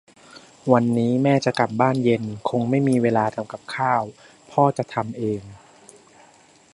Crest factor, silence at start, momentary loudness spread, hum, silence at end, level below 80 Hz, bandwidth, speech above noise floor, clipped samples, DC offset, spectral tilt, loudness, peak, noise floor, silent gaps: 20 dB; 0.35 s; 9 LU; none; 1.2 s; -62 dBFS; 11.5 kHz; 32 dB; under 0.1%; under 0.1%; -7 dB/octave; -22 LUFS; -2 dBFS; -53 dBFS; none